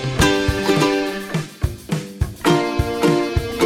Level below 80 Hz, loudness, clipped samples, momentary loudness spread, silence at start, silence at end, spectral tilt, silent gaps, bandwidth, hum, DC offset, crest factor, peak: -32 dBFS; -19 LUFS; under 0.1%; 10 LU; 0 s; 0 s; -5 dB/octave; none; 16.5 kHz; none; under 0.1%; 16 dB; -2 dBFS